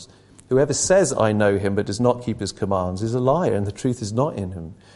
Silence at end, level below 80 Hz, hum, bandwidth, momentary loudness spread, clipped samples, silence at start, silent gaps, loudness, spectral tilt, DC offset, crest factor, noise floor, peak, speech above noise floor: 0.2 s; -44 dBFS; none; 11.5 kHz; 9 LU; under 0.1%; 0 s; none; -21 LUFS; -5.5 dB/octave; under 0.1%; 18 dB; -47 dBFS; -4 dBFS; 26 dB